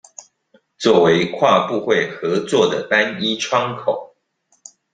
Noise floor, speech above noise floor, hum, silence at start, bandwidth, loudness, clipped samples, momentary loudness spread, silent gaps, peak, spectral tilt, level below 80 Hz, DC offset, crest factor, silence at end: -64 dBFS; 47 dB; none; 0.2 s; 9.4 kHz; -17 LUFS; under 0.1%; 8 LU; none; -2 dBFS; -4.5 dB/octave; -62 dBFS; under 0.1%; 18 dB; 0.9 s